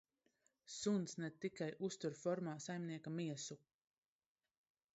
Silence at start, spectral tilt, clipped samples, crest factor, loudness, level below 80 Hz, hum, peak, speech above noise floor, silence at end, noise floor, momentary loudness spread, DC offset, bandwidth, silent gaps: 0.65 s; -6 dB/octave; under 0.1%; 18 dB; -45 LUFS; -86 dBFS; none; -28 dBFS; 38 dB; 1.4 s; -82 dBFS; 8 LU; under 0.1%; 8 kHz; none